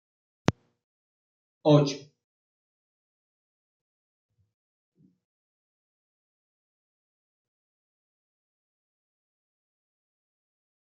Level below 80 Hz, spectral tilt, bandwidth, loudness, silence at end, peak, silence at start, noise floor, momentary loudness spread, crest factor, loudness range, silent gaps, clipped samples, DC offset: -70 dBFS; -6.5 dB/octave; 7.2 kHz; -25 LUFS; 8.85 s; -2 dBFS; 0.5 s; under -90 dBFS; 9 LU; 32 dB; 2 LU; 0.84-1.61 s; under 0.1%; under 0.1%